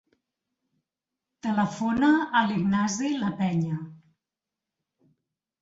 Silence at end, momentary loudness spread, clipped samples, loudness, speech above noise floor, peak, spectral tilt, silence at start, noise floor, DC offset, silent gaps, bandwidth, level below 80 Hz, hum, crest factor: 1.65 s; 11 LU; under 0.1%; -26 LUFS; 64 dB; -8 dBFS; -5.5 dB/octave; 1.45 s; -88 dBFS; under 0.1%; none; 7.8 kHz; -64 dBFS; none; 20 dB